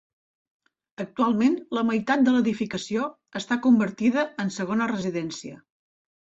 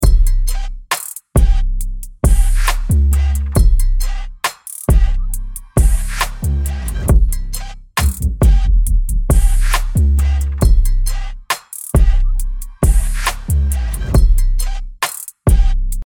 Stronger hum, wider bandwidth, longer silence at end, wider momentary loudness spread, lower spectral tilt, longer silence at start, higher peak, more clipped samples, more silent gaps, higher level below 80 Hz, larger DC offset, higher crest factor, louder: neither; second, 8 kHz vs 18 kHz; first, 0.85 s vs 0 s; first, 14 LU vs 9 LU; about the same, -5.5 dB/octave vs -5 dB/octave; first, 1 s vs 0 s; second, -10 dBFS vs -2 dBFS; neither; neither; second, -66 dBFS vs -14 dBFS; neither; about the same, 16 dB vs 12 dB; second, -24 LUFS vs -18 LUFS